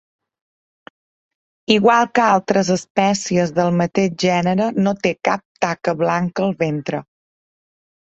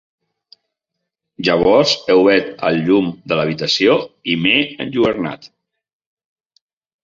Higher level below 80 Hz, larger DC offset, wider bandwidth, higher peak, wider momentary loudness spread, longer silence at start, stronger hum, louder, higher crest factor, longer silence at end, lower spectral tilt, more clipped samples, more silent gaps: second, -58 dBFS vs -52 dBFS; neither; about the same, 8.2 kHz vs 7.6 kHz; about the same, -2 dBFS vs -2 dBFS; about the same, 7 LU vs 9 LU; first, 1.7 s vs 1.4 s; neither; second, -18 LUFS vs -15 LUFS; about the same, 18 dB vs 16 dB; second, 1.2 s vs 1.6 s; about the same, -5.5 dB/octave vs -5 dB/octave; neither; first, 2.90-2.95 s, 5.45-5.55 s vs none